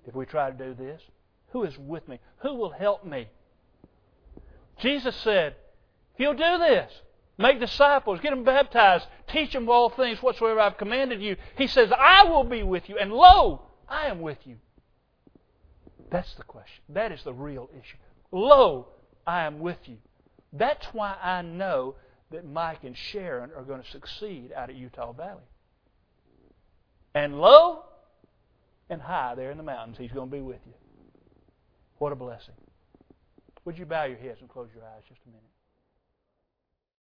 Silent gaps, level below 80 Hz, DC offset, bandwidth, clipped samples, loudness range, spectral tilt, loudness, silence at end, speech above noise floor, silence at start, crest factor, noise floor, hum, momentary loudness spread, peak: none; -46 dBFS; under 0.1%; 5.4 kHz; under 0.1%; 20 LU; -6 dB/octave; -22 LUFS; 2.4 s; 59 dB; 0.05 s; 26 dB; -82 dBFS; none; 23 LU; 0 dBFS